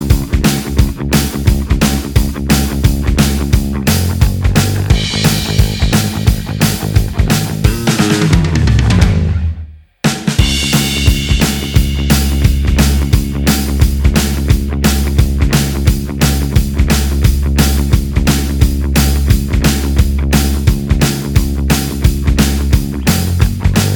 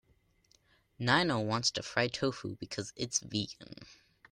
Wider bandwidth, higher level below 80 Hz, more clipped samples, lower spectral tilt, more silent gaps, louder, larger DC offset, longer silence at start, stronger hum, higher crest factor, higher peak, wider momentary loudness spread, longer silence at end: first, 20 kHz vs 12 kHz; first, -16 dBFS vs -66 dBFS; first, 0.2% vs under 0.1%; first, -5 dB/octave vs -3.5 dB/octave; neither; first, -13 LUFS vs -33 LUFS; neither; second, 0 s vs 1 s; neither; second, 12 dB vs 22 dB; first, 0 dBFS vs -12 dBFS; second, 3 LU vs 14 LU; second, 0 s vs 0.35 s